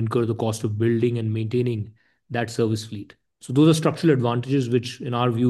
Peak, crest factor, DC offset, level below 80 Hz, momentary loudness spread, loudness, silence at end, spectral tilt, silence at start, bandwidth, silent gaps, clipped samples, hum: -6 dBFS; 18 dB; under 0.1%; -64 dBFS; 11 LU; -23 LUFS; 0 s; -7 dB/octave; 0 s; 12.5 kHz; none; under 0.1%; none